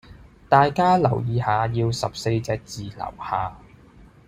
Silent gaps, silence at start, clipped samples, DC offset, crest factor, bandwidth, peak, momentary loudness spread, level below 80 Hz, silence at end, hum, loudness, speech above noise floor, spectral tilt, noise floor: none; 0.1 s; under 0.1%; under 0.1%; 20 dB; 15 kHz; -2 dBFS; 15 LU; -48 dBFS; 0.25 s; none; -22 LUFS; 28 dB; -6.5 dB/octave; -49 dBFS